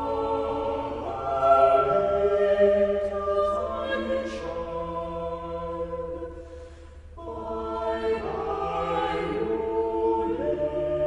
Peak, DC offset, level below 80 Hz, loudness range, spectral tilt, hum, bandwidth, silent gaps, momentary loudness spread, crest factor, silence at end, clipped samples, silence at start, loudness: -8 dBFS; under 0.1%; -44 dBFS; 11 LU; -7 dB/octave; none; 10 kHz; none; 14 LU; 18 dB; 0 s; under 0.1%; 0 s; -26 LUFS